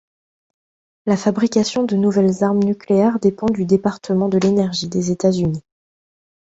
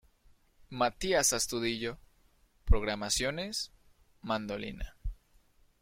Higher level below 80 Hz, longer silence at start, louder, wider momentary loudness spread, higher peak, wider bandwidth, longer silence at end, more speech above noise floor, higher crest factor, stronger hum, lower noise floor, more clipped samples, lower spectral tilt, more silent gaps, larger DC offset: second, -52 dBFS vs -40 dBFS; first, 1.05 s vs 0.7 s; first, -18 LUFS vs -32 LUFS; second, 5 LU vs 19 LU; first, -2 dBFS vs -12 dBFS; second, 8 kHz vs 16.5 kHz; first, 0.9 s vs 0.7 s; first, over 73 dB vs 35 dB; second, 16 dB vs 22 dB; neither; first, under -90 dBFS vs -66 dBFS; neither; first, -6.5 dB/octave vs -3 dB/octave; neither; neither